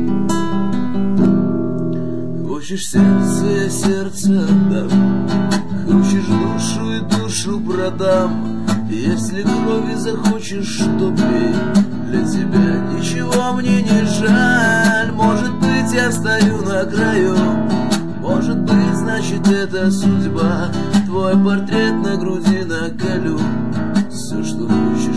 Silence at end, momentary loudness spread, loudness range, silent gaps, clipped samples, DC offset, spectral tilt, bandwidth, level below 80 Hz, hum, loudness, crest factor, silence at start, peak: 0 s; 6 LU; 3 LU; none; under 0.1%; 5%; -6 dB/octave; 11 kHz; -44 dBFS; none; -16 LUFS; 12 dB; 0 s; -2 dBFS